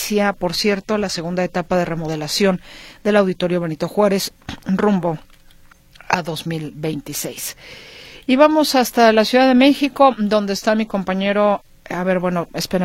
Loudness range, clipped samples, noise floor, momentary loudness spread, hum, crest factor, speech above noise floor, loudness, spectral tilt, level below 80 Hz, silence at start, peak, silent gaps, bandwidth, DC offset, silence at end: 8 LU; under 0.1%; -47 dBFS; 13 LU; none; 18 dB; 29 dB; -18 LUFS; -5 dB/octave; -48 dBFS; 0 s; 0 dBFS; none; 16.5 kHz; under 0.1%; 0 s